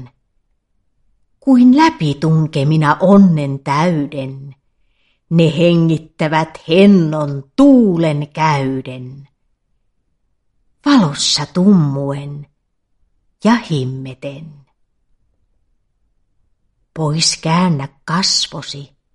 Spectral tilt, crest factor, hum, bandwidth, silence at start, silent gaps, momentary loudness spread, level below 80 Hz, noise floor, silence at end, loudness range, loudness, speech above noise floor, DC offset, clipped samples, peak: -5.5 dB/octave; 16 dB; none; 11 kHz; 0 s; none; 19 LU; -52 dBFS; -65 dBFS; 0.3 s; 10 LU; -14 LUFS; 52 dB; under 0.1%; under 0.1%; 0 dBFS